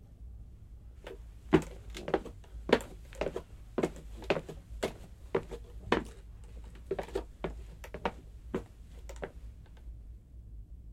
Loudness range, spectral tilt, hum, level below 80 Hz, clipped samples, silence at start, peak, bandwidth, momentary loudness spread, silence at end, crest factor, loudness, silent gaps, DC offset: 8 LU; -6 dB/octave; none; -48 dBFS; under 0.1%; 0 s; -8 dBFS; 16 kHz; 21 LU; 0 s; 30 dB; -37 LUFS; none; under 0.1%